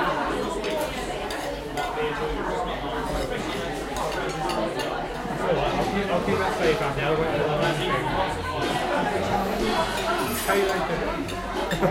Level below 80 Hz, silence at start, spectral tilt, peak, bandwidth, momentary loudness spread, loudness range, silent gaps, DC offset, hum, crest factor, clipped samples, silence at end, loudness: -40 dBFS; 0 s; -4.5 dB/octave; -8 dBFS; 16.5 kHz; 6 LU; 4 LU; none; under 0.1%; none; 16 dB; under 0.1%; 0 s; -26 LUFS